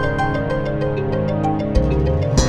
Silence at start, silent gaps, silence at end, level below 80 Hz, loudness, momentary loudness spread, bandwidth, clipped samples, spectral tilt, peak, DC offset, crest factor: 0 s; none; 0 s; -24 dBFS; -20 LUFS; 3 LU; 11 kHz; under 0.1%; -6.5 dB/octave; -2 dBFS; under 0.1%; 16 dB